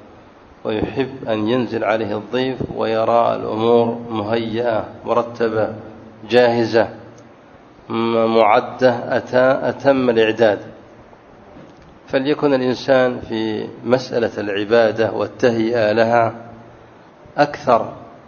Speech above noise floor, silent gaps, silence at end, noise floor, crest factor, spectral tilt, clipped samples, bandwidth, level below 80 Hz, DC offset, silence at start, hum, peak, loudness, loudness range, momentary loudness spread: 27 dB; none; 0.1 s; -44 dBFS; 18 dB; -6.5 dB/octave; under 0.1%; 7 kHz; -52 dBFS; under 0.1%; 0.65 s; none; 0 dBFS; -18 LUFS; 3 LU; 9 LU